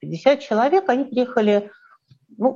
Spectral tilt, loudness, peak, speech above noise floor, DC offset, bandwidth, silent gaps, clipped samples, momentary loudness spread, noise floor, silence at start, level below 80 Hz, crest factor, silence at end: -6.5 dB/octave; -19 LUFS; -4 dBFS; 35 dB; under 0.1%; 7.4 kHz; none; under 0.1%; 5 LU; -54 dBFS; 0.05 s; -70 dBFS; 18 dB; 0 s